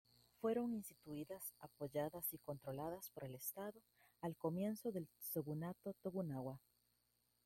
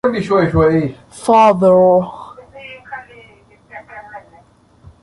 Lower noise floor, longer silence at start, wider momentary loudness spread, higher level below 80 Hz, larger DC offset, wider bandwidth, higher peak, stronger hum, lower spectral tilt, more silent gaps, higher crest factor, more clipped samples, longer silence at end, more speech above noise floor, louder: first, -83 dBFS vs -48 dBFS; first, 0.45 s vs 0.05 s; second, 9 LU vs 25 LU; second, -80 dBFS vs -40 dBFS; neither; first, 16.5 kHz vs 11.5 kHz; second, -30 dBFS vs -2 dBFS; first, 60 Hz at -80 dBFS vs none; about the same, -6.5 dB/octave vs -7 dB/octave; neither; about the same, 18 dB vs 14 dB; neither; about the same, 0.9 s vs 0.85 s; about the same, 36 dB vs 36 dB; second, -47 LUFS vs -13 LUFS